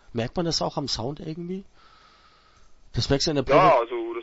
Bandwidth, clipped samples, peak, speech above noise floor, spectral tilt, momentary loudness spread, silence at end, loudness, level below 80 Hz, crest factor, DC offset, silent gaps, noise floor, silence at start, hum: 8 kHz; under 0.1%; -4 dBFS; 33 dB; -5 dB/octave; 16 LU; 0 s; -24 LUFS; -46 dBFS; 22 dB; under 0.1%; none; -56 dBFS; 0.1 s; none